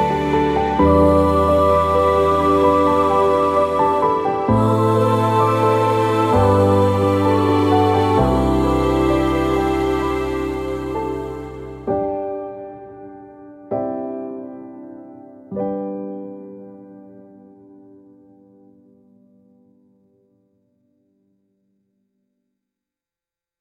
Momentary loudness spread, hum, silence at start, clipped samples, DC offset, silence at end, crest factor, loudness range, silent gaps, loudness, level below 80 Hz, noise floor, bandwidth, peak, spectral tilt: 18 LU; none; 0 s; under 0.1%; under 0.1%; 6.55 s; 16 dB; 16 LU; none; -17 LUFS; -36 dBFS; under -90 dBFS; 15.5 kHz; -2 dBFS; -7.5 dB/octave